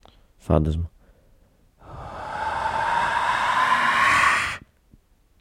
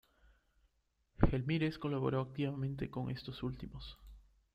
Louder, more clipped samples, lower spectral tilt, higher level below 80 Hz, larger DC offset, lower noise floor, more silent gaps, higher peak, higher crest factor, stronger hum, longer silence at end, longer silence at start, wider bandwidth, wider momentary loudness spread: first, -21 LUFS vs -38 LUFS; neither; second, -4 dB/octave vs -8.5 dB/octave; first, -42 dBFS vs -48 dBFS; neither; second, -57 dBFS vs -78 dBFS; neither; first, -6 dBFS vs -10 dBFS; second, 20 dB vs 28 dB; neither; first, 0.8 s vs 0.35 s; second, 0.45 s vs 1.2 s; first, 16.5 kHz vs 5.6 kHz; first, 19 LU vs 14 LU